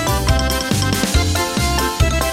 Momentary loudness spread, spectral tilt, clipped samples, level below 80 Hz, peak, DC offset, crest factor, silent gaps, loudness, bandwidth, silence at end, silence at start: 1 LU; -4 dB/octave; under 0.1%; -22 dBFS; -2 dBFS; under 0.1%; 14 dB; none; -17 LUFS; 16.5 kHz; 0 s; 0 s